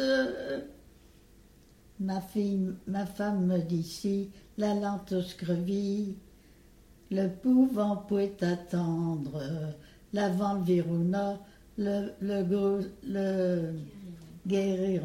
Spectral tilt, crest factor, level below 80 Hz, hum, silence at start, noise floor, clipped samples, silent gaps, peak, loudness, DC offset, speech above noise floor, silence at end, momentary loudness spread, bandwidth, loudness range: -7.5 dB/octave; 16 dB; -60 dBFS; none; 0 s; -58 dBFS; under 0.1%; none; -16 dBFS; -31 LUFS; under 0.1%; 28 dB; 0 s; 11 LU; 15.5 kHz; 3 LU